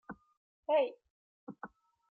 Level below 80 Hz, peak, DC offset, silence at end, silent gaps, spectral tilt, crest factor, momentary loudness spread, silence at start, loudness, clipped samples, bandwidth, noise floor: -78 dBFS; -20 dBFS; under 0.1%; 0.45 s; 0.37-0.63 s, 1.10-1.47 s; -2.5 dB/octave; 18 dB; 22 LU; 0.1 s; -34 LUFS; under 0.1%; 4.5 kHz; -54 dBFS